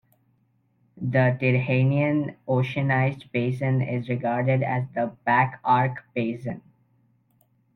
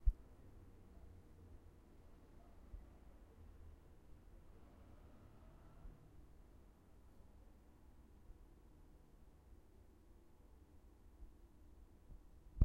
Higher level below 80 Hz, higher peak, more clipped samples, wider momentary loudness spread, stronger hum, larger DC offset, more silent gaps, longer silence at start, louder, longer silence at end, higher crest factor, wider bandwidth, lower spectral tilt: second, -64 dBFS vs -52 dBFS; first, -8 dBFS vs -18 dBFS; neither; about the same, 8 LU vs 6 LU; neither; neither; neither; first, 0.95 s vs 0 s; first, -24 LUFS vs -63 LUFS; first, 1.15 s vs 0 s; second, 18 dB vs 32 dB; second, 4.4 kHz vs 7.4 kHz; about the same, -9.5 dB/octave vs -8.5 dB/octave